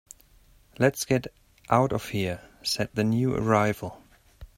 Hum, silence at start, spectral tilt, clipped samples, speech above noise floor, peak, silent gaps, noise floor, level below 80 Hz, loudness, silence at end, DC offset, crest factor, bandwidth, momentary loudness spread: none; 0.8 s; -5.5 dB/octave; under 0.1%; 32 dB; -4 dBFS; none; -58 dBFS; -54 dBFS; -26 LUFS; 0.1 s; under 0.1%; 22 dB; 16.5 kHz; 9 LU